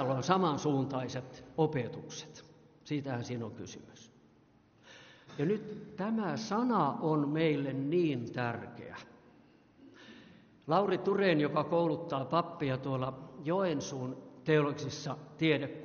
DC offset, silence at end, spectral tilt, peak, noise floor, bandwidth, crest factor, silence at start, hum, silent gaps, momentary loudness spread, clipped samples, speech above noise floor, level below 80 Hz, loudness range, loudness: under 0.1%; 0 s; -5.5 dB/octave; -12 dBFS; -65 dBFS; 6.8 kHz; 22 dB; 0 s; none; none; 17 LU; under 0.1%; 32 dB; -72 dBFS; 8 LU; -33 LUFS